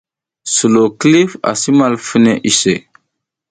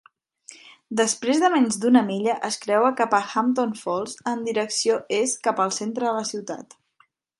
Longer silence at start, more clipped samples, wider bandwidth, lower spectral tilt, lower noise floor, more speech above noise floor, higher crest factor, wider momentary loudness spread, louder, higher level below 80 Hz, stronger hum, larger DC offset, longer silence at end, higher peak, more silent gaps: about the same, 0.45 s vs 0.5 s; neither; second, 9.4 kHz vs 11.5 kHz; about the same, -4 dB/octave vs -3.5 dB/octave; first, -73 dBFS vs -63 dBFS; first, 61 dB vs 41 dB; second, 14 dB vs 20 dB; second, 6 LU vs 9 LU; first, -12 LUFS vs -23 LUFS; first, -54 dBFS vs -74 dBFS; neither; neither; about the same, 0.7 s vs 0.75 s; first, 0 dBFS vs -4 dBFS; neither